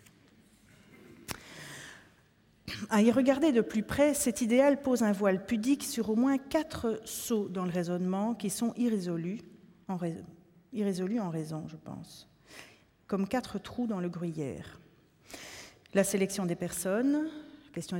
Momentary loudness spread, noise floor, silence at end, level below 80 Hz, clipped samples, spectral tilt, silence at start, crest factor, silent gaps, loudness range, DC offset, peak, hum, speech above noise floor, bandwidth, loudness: 20 LU; -65 dBFS; 0 s; -64 dBFS; under 0.1%; -5.5 dB/octave; 1.1 s; 20 dB; none; 10 LU; under 0.1%; -12 dBFS; none; 35 dB; 17 kHz; -31 LUFS